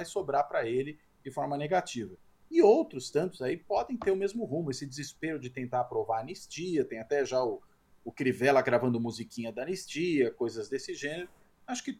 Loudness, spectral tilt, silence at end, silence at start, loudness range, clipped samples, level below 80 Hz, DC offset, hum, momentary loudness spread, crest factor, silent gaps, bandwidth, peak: -31 LUFS; -5.5 dB/octave; 0.05 s; 0 s; 4 LU; under 0.1%; -68 dBFS; under 0.1%; none; 14 LU; 20 dB; none; 14.5 kHz; -10 dBFS